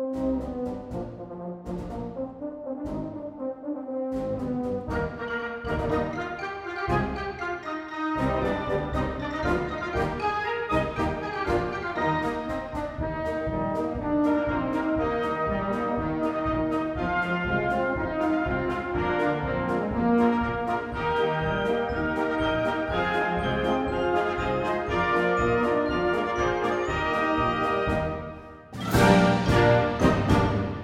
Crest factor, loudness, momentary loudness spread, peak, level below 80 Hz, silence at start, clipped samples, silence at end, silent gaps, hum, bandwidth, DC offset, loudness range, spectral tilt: 20 dB; -27 LUFS; 11 LU; -6 dBFS; -40 dBFS; 0 s; under 0.1%; 0 s; none; none; 16 kHz; under 0.1%; 7 LU; -7 dB/octave